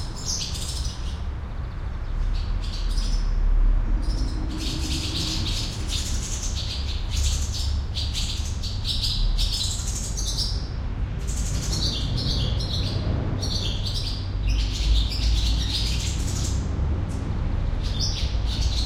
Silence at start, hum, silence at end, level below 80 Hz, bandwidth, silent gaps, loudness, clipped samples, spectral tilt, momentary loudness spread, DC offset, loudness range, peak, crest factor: 0 s; none; 0 s; -26 dBFS; 15.5 kHz; none; -27 LUFS; under 0.1%; -4 dB/octave; 6 LU; under 0.1%; 3 LU; -10 dBFS; 16 dB